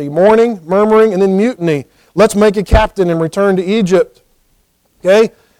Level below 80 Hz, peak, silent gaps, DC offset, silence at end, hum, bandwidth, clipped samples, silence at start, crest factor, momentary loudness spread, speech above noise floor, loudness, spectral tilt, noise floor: -26 dBFS; 0 dBFS; none; under 0.1%; 0.3 s; none; 15.5 kHz; under 0.1%; 0 s; 12 dB; 8 LU; 46 dB; -12 LUFS; -6.5 dB/octave; -57 dBFS